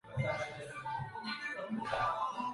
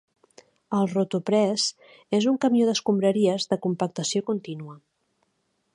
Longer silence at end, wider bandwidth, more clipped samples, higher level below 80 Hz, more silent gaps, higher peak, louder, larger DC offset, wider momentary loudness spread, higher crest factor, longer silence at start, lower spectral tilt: second, 0 s vs 0.95 s; about the same, 11.5 kHz vs 11.5 kHz; neither; first, -62 dBFS vs -72 dBFS; neither; second, -22 dBFS vs -8 dBFS; second, -38 LUFS vs -24 LUFS; neither; second, 6 LU vs 9 LU; about the same, 16 dB vs 16 dB; second, 0.05 s vs 0.7 s; about the same, -5.5 dB/octave vs -5 dB/octave